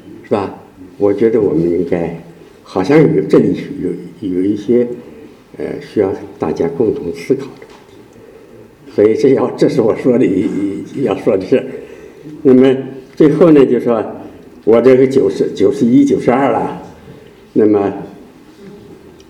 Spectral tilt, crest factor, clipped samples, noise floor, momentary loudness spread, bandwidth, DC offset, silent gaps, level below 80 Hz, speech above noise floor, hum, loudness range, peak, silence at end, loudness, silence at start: -8 dB/octave; 14 dB; 0.2%; -39 dBFS; 16 LU; 11 kHz; under 0.1%; none; -50 dBFS; 27 dB; none; 7 LU; 0 dBFS; 0.35 s; -13 LUFS; 0.05 s